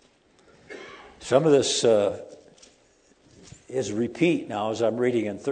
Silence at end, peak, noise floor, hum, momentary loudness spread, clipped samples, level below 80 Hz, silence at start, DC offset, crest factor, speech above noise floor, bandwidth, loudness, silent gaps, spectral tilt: 0 s; -4 dBFS; -60 dBFS; none; 22 LU; under 0.1%; -64 dBFS; 0.7 s; under 0.1%; 22 dB; 38 dB; 9.4 kHz; -24 LUFS; none; -4.5 dB/octave